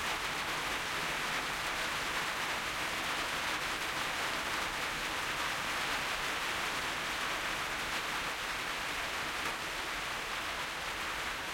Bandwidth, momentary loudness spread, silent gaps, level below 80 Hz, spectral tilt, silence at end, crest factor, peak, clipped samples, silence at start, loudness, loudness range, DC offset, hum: 16.5 kHz; 2 LU; none; -56 dBFS; -1.5 dB/octave; 0 s; 14 dB; -22 dBFS; under 0.1%; 0 s; -34 LUFS; 1 LU; under 0.1%; none